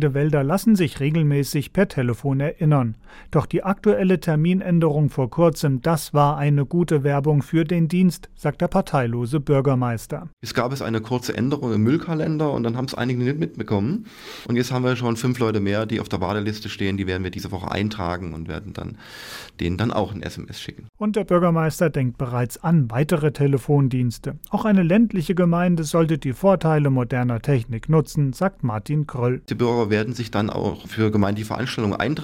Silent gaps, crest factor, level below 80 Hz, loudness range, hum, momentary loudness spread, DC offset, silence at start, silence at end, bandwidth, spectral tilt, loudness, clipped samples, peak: 10.33-10.37 s, 20.89-20.93 s; 14 dB; -46 dBFS; 5 LU; none; 9 LU; under 0.1%; 0 s; 0 s; 16.5 kHz; -7 dB/octave; -21 LUFS; under 0.1%; -6 dBFS